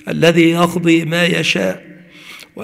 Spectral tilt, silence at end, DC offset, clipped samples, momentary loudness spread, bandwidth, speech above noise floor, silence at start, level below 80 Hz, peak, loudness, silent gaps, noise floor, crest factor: -5 dB/octave; 0 s; under 0.1%; under 0.1%; 20 LU; 15.5 kHz; 24 dB; 0.05 s; -54 dBFS; 0 dBFS; -13 LUFS; none; -38 dBFS; 16 dB